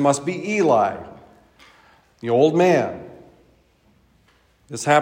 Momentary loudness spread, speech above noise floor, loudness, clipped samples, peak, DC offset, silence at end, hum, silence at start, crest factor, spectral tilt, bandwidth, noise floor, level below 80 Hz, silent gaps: 21 LU; 40 dB; -19 LUFS; under 0.1%; -4 dBFS; under 0.1%; 0 s; none; 0 s; 18 dB; -5.5 dB/octave; 16 kHz; -59 dBFS; -64 dBFS; none